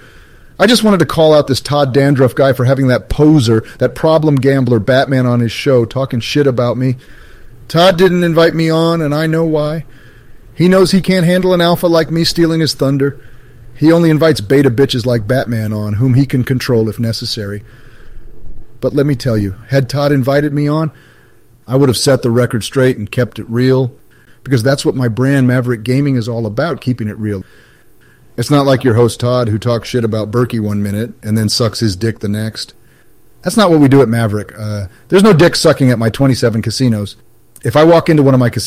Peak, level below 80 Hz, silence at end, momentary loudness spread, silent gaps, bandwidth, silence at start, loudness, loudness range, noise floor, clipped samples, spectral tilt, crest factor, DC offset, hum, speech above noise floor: 0 dBFS; -38 dBFS; 0 s; 10 LU; none; 16 kHz; 0.6 s; -12 LUFS; 5 LU; -47 dBFS; under 0.1%; -6 dB/octave; 12 dB; 0.1%; none; 36 dB